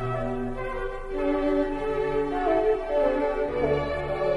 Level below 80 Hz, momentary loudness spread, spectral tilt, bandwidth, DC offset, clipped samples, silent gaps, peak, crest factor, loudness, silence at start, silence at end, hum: -38 dBFS; 8 LU; -7.5 dB/octave; 11.5 kHz; under 0.1%; under 0.1%; none; -12 dBFS; 14 dB; -26 LUFS; 0 s; 0 s; none